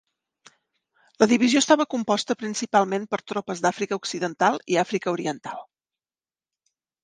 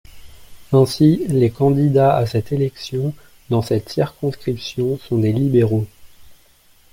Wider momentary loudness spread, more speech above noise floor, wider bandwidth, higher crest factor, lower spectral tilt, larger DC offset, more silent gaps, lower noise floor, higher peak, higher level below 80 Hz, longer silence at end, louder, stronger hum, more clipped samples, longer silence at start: about the same, 10 LU vs 10 LU; first, over 67 dB vs 35 dB; second, 10 kHz vs 16.5 kHz; first, 22 dB vs 16 dB; second, -3.5 dB/octave vs -8 dB/octave; neither; neither; first, under -90 dBFS vs -52 dBFS; about the same, -4 dBFS vs -2 dBFS; second, -72 dBFS vs -48 dBFS; first, 1.4 s vs 0.6 s; second, -23 LUFS vs -18 LUFS; neither; neither; first, 1.2 s vs 0.15 s